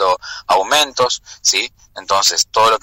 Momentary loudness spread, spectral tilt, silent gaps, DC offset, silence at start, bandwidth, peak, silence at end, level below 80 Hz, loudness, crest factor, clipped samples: 8 LU; 0.5 dB/octave; none; under 0.1%; 0 s; 16.5 kHz; -4 dBFS; 0.05 s; -52 dBFS; -15 LUFS; 12 dB; under 0.1%